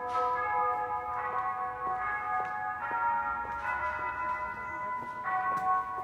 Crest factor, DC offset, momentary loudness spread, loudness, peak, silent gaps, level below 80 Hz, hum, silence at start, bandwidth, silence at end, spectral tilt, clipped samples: 14 dB; under 0.1%; 6 LU; -32 LUFS; -18 dBFS; none; -60 dBFS; none; 0 s; 15.5 kHz; 0 s; -5 dB/octave; under 0.1%